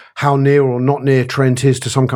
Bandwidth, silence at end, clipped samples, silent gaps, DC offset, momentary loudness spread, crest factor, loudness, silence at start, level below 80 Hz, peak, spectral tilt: 12.5 kHz; 0 s; under 0.1%; none; under 0.1%; 4 LU; 14 dB; -14 LUFS; 0.15 s; -56 dBFS; 0 dBFS; -6.5 dB/octave